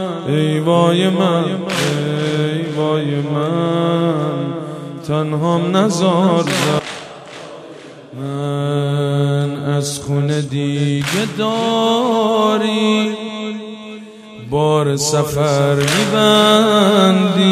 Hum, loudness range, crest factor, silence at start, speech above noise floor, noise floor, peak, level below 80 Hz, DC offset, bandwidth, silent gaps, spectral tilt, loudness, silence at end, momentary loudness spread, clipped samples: none; 5 LU; 16 dB; 0 s; 21 dB; -35 dBFS; 0 dBFS; -52 dBFS; under 0.1%; 14.5 kHz; none; -5.5 dB/octave; -16 LUFS; 0 s; 16 LU; under 0.1%